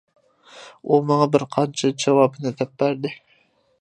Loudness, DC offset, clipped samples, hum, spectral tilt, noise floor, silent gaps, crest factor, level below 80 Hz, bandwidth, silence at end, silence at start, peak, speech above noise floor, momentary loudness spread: -21 LUFS; under 0.1%; under 0.1%; none; -6 dB/octave; -61 dBFS; none; 20 dB; -68 dBFS; 10.5 kHz; 0.65 s; 0.55 s; -2 dBFS; 41 dB; 12 LU